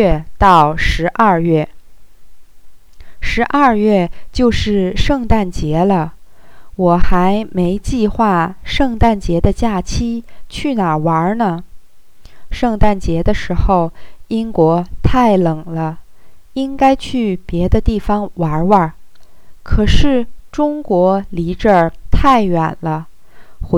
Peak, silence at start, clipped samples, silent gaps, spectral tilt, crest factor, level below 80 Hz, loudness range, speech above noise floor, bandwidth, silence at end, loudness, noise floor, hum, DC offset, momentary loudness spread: 0 dBFS; 0 s; 0.2%; none; -7 dB/octave; 14 dB; -24 dBFS; 3 LU; 29 dB; 11.5 kHz; 0 s; -15 LUFS; -42 dBFS; none; 2%; 10 LU